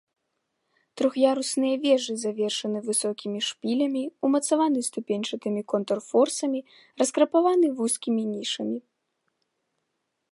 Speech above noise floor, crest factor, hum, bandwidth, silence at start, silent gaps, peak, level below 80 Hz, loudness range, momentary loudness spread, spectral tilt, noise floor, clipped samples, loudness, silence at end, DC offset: 54 dB; 18 dB; none; 11.5 kHz; 0.95 s; none; -8 dBFS; -82 dBFS; 2 LU; 7 LU; -3.5 dB/octave; -79 dBFS; under 0.1%; -25 LUFS; 1.5 s; under 0.1%